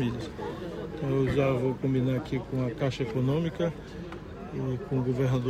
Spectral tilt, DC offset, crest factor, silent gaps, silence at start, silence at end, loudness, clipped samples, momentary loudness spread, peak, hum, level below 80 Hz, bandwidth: -8 dB/octave; under 0.1%; 16 dB; none; 0 s; 0 s; -30 LUFS; under 0.1%; 12 LU; -12 dBFS; none; -48 dBFS; 8.8 kHz